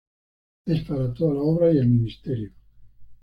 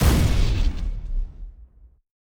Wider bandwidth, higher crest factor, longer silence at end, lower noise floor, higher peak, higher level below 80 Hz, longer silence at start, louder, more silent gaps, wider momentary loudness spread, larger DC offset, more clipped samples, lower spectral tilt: second, 5.4 kHz vs over 20 kHz; about the same, 14 dB vs 16 dB; second, 0.1 s vs 0.7 s; about the same, -45 dBFS vs -48 dBFS; second, -10 dBFS vs -6 dBFS; second, -48 dBFS vs -24 dBFS; first, 0.65 s vs 0 s; about the same, -23 LUFS vs -25 LUFS; neither; second, 12 LU vs 22 LU; neither; neither; first, -10.5 dB/octave vs -5.5 dB/octave